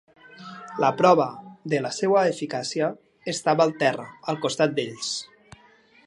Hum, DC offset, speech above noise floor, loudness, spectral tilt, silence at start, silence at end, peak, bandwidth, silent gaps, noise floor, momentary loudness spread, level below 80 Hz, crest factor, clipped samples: none; under 0.1%; 33 dB; -24 LUFS; -4.5 dB/octave; 0.3 s; 0.8 s; -4 dBFS; 11.5 kHz; none; -56 dBFS; 17 LU; -70 dBFS; 20 dB; under 0.1%